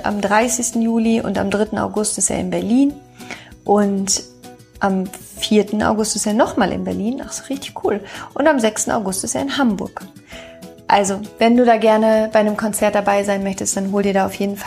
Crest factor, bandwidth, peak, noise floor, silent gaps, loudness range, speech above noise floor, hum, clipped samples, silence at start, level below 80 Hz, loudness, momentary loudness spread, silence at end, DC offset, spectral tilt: 18 dB; 15.5 kHz; 0 dBFS; -41 dBFS; none; 4 LU; 24 dB; none; under 0.1%; 0 s; -48 dBFS; -18 LUFS; 14 LU; 0 s; under 0.1%; -4 dB/octave